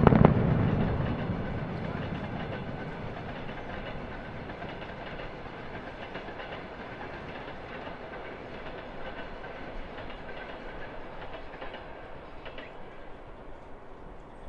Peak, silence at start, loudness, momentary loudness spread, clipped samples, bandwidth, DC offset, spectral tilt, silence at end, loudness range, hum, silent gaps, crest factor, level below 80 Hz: 0 dBFS; 0 s; -34 LUFS; 16 LU; under 0.1%; 6.6 kHz; under 0.1%; -9 dB/octave; 0 s; 10 LU; none; none; 32 dB; -44 dBFS